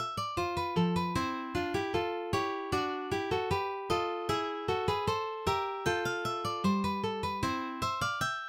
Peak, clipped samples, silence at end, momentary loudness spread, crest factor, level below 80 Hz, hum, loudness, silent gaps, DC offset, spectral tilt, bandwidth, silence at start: -16 dBFS; under 0.1%; 0 s; 3 LU; 16 dB; -54 dBFS; none; -32 LUFS; none; under 0.1%; -5 dB/octave; 16.5 kHz; 0 s